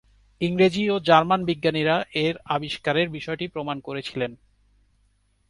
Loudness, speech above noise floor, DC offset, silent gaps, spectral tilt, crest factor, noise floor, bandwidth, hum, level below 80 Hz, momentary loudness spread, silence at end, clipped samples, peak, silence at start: -23 LUFS; 42 dB; under 0.1%; none; -6 dB/octave; 22 dB; -65 dBFS; 11.5 kHz; 50 Hz at -60 dBFS; -58 dBFS; 12 LU; 1.15 s; under 0.1%; -2 dBFS; 0.4 s